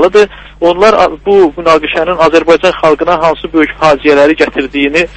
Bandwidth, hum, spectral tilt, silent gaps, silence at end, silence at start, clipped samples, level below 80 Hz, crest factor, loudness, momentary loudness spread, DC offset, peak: 9.8 kHz; none; -5 dB/octave; none; 0 s; 0 s; 2%; -34 dBFS; 8 dB; -9 LUFS; 5 LU; under 0.1%; 0 dBFS